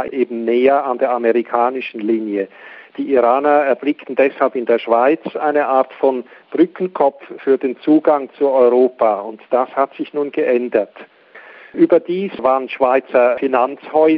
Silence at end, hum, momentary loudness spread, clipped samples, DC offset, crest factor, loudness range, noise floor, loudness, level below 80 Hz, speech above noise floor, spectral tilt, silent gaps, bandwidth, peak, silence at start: 0 s; none; 9 LU; under 0.1%; under 0.1%; 16 dB; 2 LU; -41 dBFS; -16 LUFS; -66 dBFS; 25 dB; -9 dB/octave; none; 5.2 kHz; 0 dBFS; 0 s